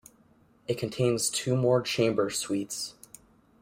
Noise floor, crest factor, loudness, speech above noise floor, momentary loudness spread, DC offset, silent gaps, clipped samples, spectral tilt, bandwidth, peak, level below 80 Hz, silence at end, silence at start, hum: -62 dBFS; 18 dB; -28 LUFS; 34 dB; 10 LU; under 0.1%; none; under 0.1%; -4.5 dB/octave; 16 kHz; -10 dBFS; -66 dBFS; 0.7 s; 0.7 s; none